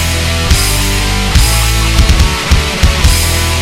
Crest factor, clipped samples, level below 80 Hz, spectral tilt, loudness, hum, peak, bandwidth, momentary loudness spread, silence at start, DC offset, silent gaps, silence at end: 10 dB; under 0.1%; -12 dBFS; -3.5 dB/octave; -10 LUFS; none; 0 dBFS; 17 kHz; 3 LU; 0 s; under 0.1%; none; 0 s